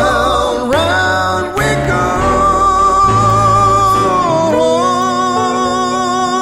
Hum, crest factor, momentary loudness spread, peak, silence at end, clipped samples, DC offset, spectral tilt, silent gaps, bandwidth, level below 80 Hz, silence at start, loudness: none; 10 dB; 5 LU; 0 dBFS; 0 s; under 0.1%; 0.2%; -4.5 dB/octave; none; 16 kHz; -30 dBFS; 0 s; -12 LUFS